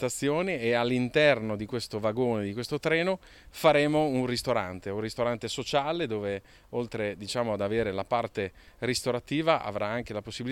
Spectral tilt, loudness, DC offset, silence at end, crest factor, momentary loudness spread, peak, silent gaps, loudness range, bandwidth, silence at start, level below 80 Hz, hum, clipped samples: -5 dB/octave; -29 LUFS; under 0.1%; 0 s; 20 dB; 11 LU; -8 dBFS; none; 4 LU; 16.5 kHz; 0 s; -56 dBFS; none; under 0.1%